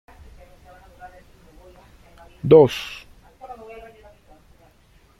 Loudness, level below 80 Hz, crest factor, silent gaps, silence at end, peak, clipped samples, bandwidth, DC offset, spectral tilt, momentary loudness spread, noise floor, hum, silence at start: -16 LUFS; -52 dBFS; 22 dB; none; 1.65 s; -2 dBFS; under 0.1%; 14.5 kHz; under 0.1%; -7 dB/octave; 28 LU; -55 dBFS; none; 2.45 s